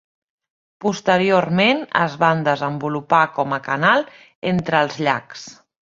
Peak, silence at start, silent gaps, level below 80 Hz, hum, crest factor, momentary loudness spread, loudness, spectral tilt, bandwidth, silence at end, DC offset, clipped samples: -2 dBFS; 0.8 s; 4.35-4.42 s; -60 dBFS; none; 18 dB; 9 LU; -19 LUFS; -5.5 dB/octave; 7.6 kHz; 0.4 s; under 0.1%; under 0.1%